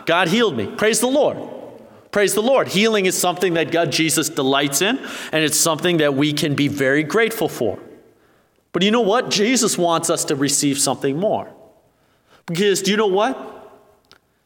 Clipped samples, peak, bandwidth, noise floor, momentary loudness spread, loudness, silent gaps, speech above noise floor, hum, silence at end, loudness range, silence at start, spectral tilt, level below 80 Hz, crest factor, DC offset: under 0.1%; -2 dBFS; 19 kHz; -59 dBFS; 9 LU; -18 LUFS; none; 41 dB; none; 0.8 s; 2 LU; 0 s; -3.5 dB/octave; -64 dBFS; 18 dB; under 0.1%